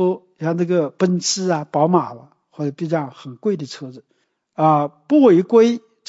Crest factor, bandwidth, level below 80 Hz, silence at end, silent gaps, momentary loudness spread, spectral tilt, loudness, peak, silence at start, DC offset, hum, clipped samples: 16 dB; 8 kHz; -72 dBFS; 0.3 s; none; 18 LU; -6 dB/octave; -18 LUFS; -2 dBFS; 0 s; under 0.1%; none; under 0.1%